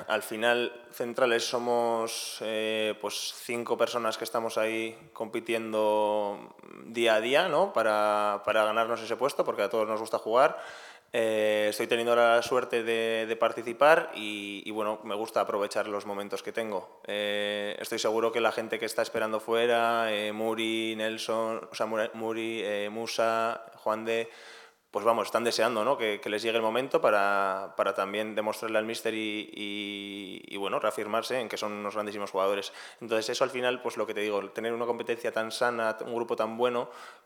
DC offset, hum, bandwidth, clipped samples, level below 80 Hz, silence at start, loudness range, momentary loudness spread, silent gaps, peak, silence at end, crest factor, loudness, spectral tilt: under 0.1%; none; 18.5 kHz; under 0.1%; -84 dBFS; 0 s; 5 LU; 10 LU; none; -6 dBFS; 0.1 s; 24 dB; -29 LUFS; -3 dB/octave